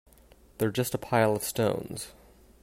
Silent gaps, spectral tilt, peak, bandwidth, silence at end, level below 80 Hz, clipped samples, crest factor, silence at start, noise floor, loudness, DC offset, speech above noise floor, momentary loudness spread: none; -5 dB/octave; -10 dBFS; 16 kHz; 0.5 s; -58 dBFS; under 0.1%; 20 dB; 0.6 s; -57 dBFS; -29 LUFS; under 0.1%; 29 dB; 14 LU